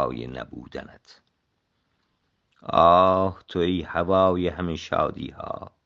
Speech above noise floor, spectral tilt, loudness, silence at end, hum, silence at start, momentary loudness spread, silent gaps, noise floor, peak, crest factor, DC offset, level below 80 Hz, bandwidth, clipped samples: 50 dB; -7 dB/octave; -22 LUFS; 0.15 s; none; 0 s; 20 LU; none; -74 dBFS; -4 dBFS; 22 dB; under 0.1%; -52 dBFS; 7.2 kHz; under 0.1%